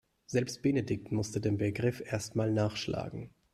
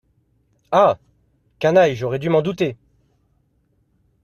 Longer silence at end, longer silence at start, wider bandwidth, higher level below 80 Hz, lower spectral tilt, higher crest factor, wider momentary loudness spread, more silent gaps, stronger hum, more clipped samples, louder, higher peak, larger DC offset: second, 0.25 s vs 1.5 s; second, 0.3 s vs 0.7 s; about the same, 13.5 kHz vs 13.5 kHz; about the same, -62 dBFS vs -58 dBFS; about the same, -6 dB/octave vs -6.5 dB/octave; about the same, 18 dB vs 18 dB; second, 6 LU vs 9 LU; neither; neither; neither; second, -33 LUFS vs -19 LUFS; second, -14 dBFS vs -2 dBFS; neither